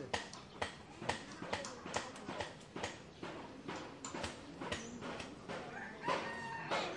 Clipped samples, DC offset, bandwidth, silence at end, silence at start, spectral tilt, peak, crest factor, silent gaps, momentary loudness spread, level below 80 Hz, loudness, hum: under 0.1%; under 0.1%; 11.5 kHz; 0 s; 0 s; -3.5 dB/octave; -20 dBFS; 24 dB; none; 8 LU; -68 dBFS; -44 LUFS; none